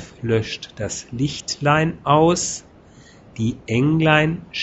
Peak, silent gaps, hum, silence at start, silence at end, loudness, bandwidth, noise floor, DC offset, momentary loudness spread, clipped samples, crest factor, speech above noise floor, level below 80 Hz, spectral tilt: 0 dBFS; none; none; 0 s; 0 s; -20 LUFS; 8.4 kHz; -47 dBFS; under 0.1%; 13 LU; under 0.1%; 20 dB; 27 dB; -46 dBFS; -5 dB/octave